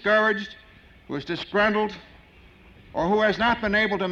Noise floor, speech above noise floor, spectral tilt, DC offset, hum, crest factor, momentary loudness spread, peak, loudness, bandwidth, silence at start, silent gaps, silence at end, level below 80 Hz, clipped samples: -51 dBFS; 28 dB; -6 dB/octave; under 0.1%; none; 16 dB; 14 LU; -10 dBFS; -23 LUFS; 7.6 kHz; 0 s; none; 0 s; -50 dBFS; under 0.1%